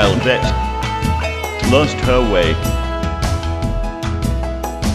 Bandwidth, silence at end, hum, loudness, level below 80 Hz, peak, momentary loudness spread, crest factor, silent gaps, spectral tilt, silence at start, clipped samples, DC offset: 15 kHz; 0 s; none; -18 LUFS; -22 dBFS; 0 dBFS; 8 LU; 16 dB; none; -5.5 dB/octave; 0 s; under 0.1%; under 0.1%